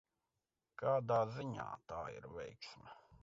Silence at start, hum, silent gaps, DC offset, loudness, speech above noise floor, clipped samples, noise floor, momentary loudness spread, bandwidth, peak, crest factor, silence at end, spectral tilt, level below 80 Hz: 0.8 s; none; none; under 0.1%; -41 LUFS; over 49 dB; under 0.1%; under -90 dBFS; 21 LU; 7.6 kHz; -24 dBFS; 20 dB; 0.05 s; -5.5 dB/octave; -70 dBFS